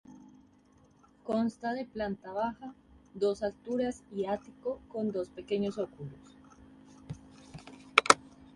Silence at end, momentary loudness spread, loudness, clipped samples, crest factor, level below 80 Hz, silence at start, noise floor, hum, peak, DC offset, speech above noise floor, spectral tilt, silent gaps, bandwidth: 0.1 s; 21 LU; -32 LUFS; under 0.1%; 34 dB; -64 dBFS; 0.1 s; -63 dBFS; none; 0 dBFS; under 0.1%; 28 dB; -3.5 dB/octave; none; 11.5 kHz